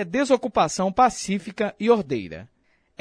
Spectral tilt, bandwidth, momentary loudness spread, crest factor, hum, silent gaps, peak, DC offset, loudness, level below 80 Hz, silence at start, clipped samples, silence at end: -4.5 dB/octave; 10.5 kHz; 10 LU; 18 dB; none; none; -6 dBFS; under 0.1%; -22 LUFS; -54 dBFS; 0 s; under 0.1%; 0.55 s